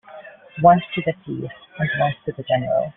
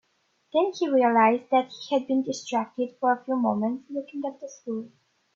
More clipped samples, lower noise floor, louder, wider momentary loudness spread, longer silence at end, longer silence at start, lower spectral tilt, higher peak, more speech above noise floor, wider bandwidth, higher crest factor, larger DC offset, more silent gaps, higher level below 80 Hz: neither; second, -42 dBFS vs -70 dBFS; first, -21 LUFS vs -26 LUFS; first, 21 LU vs 14 LU; second, 0.05 s vs 0.5 s; second, 0.1 s vs 0.55 s; about the same, -5 dB/octave vs -5 dB/octave; first, -2 dBFS vs -8 dBFS; second, 21 dB vs 45 dB; second, 3.9 kHz vs 7.8 kHz; about the same, 20 dB vs 18 dB; neither; neither; first, -54 dBFS vs -76 dBFS